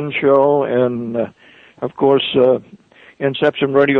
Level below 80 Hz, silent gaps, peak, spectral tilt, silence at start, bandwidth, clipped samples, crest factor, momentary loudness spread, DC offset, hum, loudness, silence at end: -58 dBFS; none; -2 dBFS; -8 dB/octave; 0 s; 4.2 kHz; under 0.1%; 14 dB; 10 LU; under 0.1%; none; -16 LUFS; 0 s